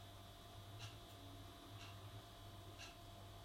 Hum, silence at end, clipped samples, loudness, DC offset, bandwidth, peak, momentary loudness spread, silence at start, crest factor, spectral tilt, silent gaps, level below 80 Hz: none; 0 s; under 0.1%; -57 LUFS; under 0.1%; 16 kHz; -40 dBFS; 3 LU; 0 s; 16 dB; -4 dB/octave; none; -66 dBFS